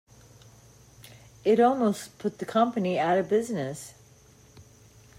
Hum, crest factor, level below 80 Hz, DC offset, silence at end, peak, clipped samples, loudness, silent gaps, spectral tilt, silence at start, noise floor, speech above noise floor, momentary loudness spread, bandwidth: none; 18 dB; -66 dBFS; under 0.1%; 0.55 s; -10 dBFS; under 0.1%; -26 LUFS; none; -6 dB/octave; 1.1 s; -55 dBFS; 30 dB; 13 LU; 16 kHz